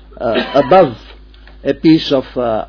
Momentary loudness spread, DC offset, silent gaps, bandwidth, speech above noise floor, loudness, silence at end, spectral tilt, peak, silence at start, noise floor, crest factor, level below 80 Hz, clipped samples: 11 LU; under 0.1%; none; 5.4 kHz; 26 dB; -13 LUFS; 0 s; -7.5 dB/octave; 0 dBFS; 0.2 s; -38 dBFS; 14 dB; -38 dBFS; under 0.1%